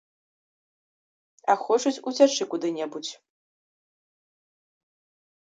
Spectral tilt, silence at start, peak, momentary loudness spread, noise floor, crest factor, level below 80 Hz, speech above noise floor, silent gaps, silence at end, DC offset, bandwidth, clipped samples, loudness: -2.5 dB/octave; 1.45 s; -6 dBFS; 12 LU; under -90 dBFS; 24 dB; -84 dBFS; over 66 dB; none; 2.4 s; under 0.1%; 9 kHz; under 0.1%; -25 LUFS